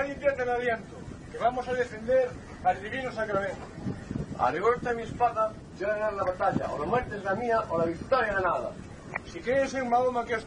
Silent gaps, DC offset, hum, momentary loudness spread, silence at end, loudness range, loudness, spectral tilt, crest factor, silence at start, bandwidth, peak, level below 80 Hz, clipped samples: none; under 0.1%; none; 11 LU; 0 s; 2 LU; -29 LUFS; -6 dB/octave; 18 dB; 0 s; 10 kHz; -12 dBFS; -50 dBFS; under 0.1%